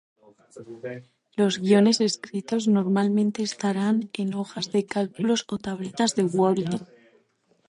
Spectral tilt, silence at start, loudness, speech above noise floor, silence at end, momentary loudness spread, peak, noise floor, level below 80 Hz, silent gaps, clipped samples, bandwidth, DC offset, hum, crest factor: -5.5 dB/octave; 0.55 s; -24 LUFS; 42 dB; 0.85 s; 15 LU; -8 dBFS; -66 dBFS; -68 dBFS; none; under 0.1%; 11 kHz; under 0.1%; none; 18 dB